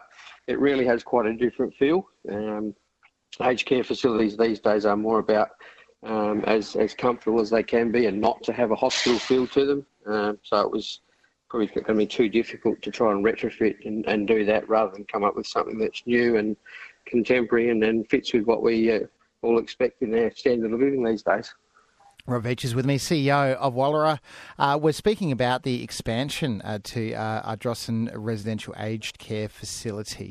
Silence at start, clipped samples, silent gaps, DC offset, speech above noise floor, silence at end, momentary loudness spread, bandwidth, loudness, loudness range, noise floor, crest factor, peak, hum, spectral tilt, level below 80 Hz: 0.2 s; under 0.1%; none; under 0.1%; 40 dB; 0 s; 10 LU; 13.5 kHz; -24 LUFS; 3 LU; -64 dBFS; 18 dB; -6 dBFS; none; -5.5 dB/octave; -56 dBFS